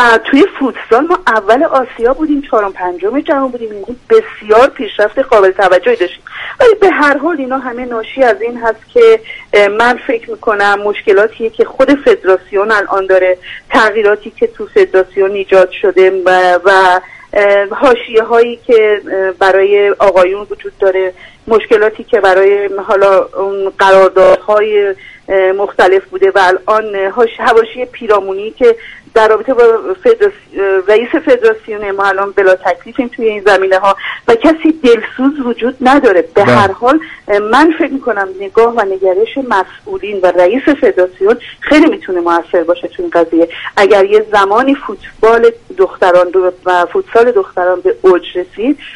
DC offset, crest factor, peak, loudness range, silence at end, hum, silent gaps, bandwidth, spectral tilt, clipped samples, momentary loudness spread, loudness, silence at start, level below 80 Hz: under 0.1%; 10 dB; 0 dBFS; 2 LU; 0 s; none; none; 11 kHz; -5 dB/octave; 0.3%; 8 LU; -10 LUFS; 0 s; -42 dBFS